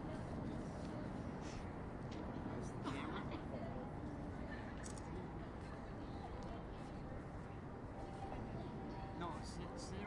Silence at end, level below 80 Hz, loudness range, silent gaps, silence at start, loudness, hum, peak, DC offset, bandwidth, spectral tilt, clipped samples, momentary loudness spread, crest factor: 0 s; -56 dBFS; 3 LU; none; 0 s; -48 LUFS; none; -32 dBFS; under 0.1%; 11 kHz; -6.5 dB/octave; under 0.1%; 4 LU; 16 dB